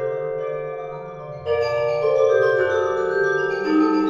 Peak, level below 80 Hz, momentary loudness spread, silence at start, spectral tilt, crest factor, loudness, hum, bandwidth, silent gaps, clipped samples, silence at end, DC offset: -6 dBFS; -58 dBFS; 14 LU; 0 s; -6 dB/octave; 14 dB; -21 LUFS; none; 7.4 kHz; none; under 0.1%; 0 s; under 0.1%